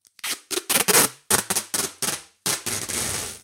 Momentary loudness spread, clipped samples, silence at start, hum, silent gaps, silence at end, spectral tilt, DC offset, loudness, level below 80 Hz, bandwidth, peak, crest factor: 10 LU; under 0.1%; 0.25 s; none; none; 0.05 s; -1 dB/octave; under 0.1%; -22 LUFS; -54 dBFS; 17 kHz; -2 dBFS; 24 dB